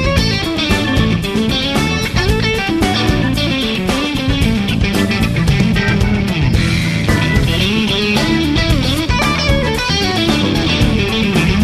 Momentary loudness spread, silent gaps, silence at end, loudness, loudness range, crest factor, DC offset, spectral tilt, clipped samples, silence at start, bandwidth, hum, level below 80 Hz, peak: 2 LU; none; 0 s; -14 LUFS; 1 LU; 14 dB; under 0.1%; -5 dB/octave; under 0.1%; 0 s; 14 kHz; none; -24 dBFS; 0 dBFS